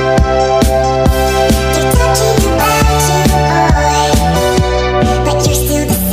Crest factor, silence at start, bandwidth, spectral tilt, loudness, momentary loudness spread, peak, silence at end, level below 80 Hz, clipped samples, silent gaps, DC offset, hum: 10 dB; 0 s; 16 kHz; -5 dB/octave; -11 LUFS; 2 LU; 0 dBFS; 0 s; -18 dBFS; under 0.1%; none; under 0.1%; none